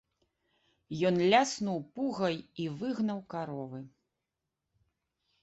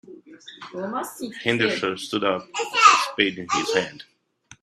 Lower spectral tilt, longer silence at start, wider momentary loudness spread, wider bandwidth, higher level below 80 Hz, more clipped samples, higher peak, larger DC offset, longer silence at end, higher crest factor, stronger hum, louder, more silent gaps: first, -5 dB/octave vs -2.5 dB/octave; first, 0.9 s vs 0.1 s; second, 15 LU vs 18 LU; second, 8.2 kHz vs 15 kHz; about the same, -72 dBFS vs -68 dBFS; neither; second, -12 dBFS vs 0 dBFS; neither; first, 1.55 s vs 0.6 s; about the same, 22 dB vs 24 dB; neither; second, -32 LUFS vs -21 LUFS; neither